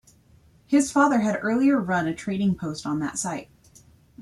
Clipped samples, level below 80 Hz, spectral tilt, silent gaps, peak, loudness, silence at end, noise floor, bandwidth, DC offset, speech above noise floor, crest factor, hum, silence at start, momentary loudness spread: under 0.1%; -58 dBFS; -5.5 dB/octave; none; -6 dBFS; -24 LUFS; 0 s; -56 dBFS; 12.5 kHz; under 0.1%; 34 dB; 18 dB; none; 0.7 s; 9 LU